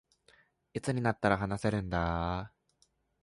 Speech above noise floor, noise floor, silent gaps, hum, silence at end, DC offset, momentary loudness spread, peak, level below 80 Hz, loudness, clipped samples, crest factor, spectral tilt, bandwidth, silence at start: 41 dB; -73 dBFS; none; none; 0.75 s; under 0.1%; 10 LU; -12 dBFS; -48 dBFS; -33 LUFS; under 0.1%; 22 dB; -6.5 dB/octave; 11.5 kHz; 0.75 s